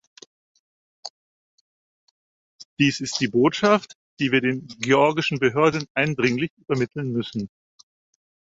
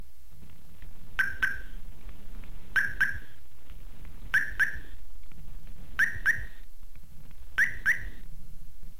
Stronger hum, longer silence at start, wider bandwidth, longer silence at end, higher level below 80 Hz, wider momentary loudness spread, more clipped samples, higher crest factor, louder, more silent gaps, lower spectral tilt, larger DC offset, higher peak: neither; first, 1.05 s vs 0 s; second, 8 kHz vs 17 kHz; first, 1 s vs 0 s; second, -62 dBFS vs -44 dBFS; second, 17 LU vs 25 LU; neither; about the same, 22 dB vs 20 dB; first, -22 LUFS vs -29 LUFS; first, 1.10-2.59 s, 2.65-2.77 s, 3.95-4.17 s, 5.90-5.95 s, 6.50-6.57 s vs none; first, -5 dB/octave vs -2.5 dB/octave; second, under 0.1% vs 3%; first, -2 dBFS vs -12 dBFS